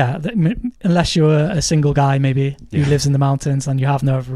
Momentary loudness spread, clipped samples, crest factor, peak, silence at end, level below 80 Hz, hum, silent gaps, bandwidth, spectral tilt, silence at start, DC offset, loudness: 5 LU; under 0.1%; 12 dB; -4 dBFS; 0 s; -38 dBFS; none; none; 12 kHz; -6 dB/octave; 0 s; under 0.1%; -17 LUFS